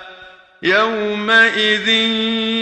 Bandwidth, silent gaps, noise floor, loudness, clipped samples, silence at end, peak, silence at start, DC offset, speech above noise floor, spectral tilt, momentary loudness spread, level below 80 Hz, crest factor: 10 kHz; none; -41 dBFS; -14 LUFS; under 0.1%; 0 s; 0 dBFS; 0 s; under 0.1%; 26 dB; -3.5 dB/octave; 7 LU; -56 dBFS; 16 dB